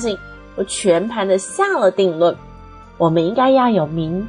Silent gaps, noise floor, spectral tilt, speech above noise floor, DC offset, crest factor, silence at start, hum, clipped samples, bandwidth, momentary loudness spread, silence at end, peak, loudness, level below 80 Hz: none; -39 dBFS; -5 dB/octave; 23 dB; under 0.1%; 14 dB; 0 s; none; under 0.1%; 10 kHz; 11 LU; 0 s; -4 dBFS; -17 LUFS; -46 dBFS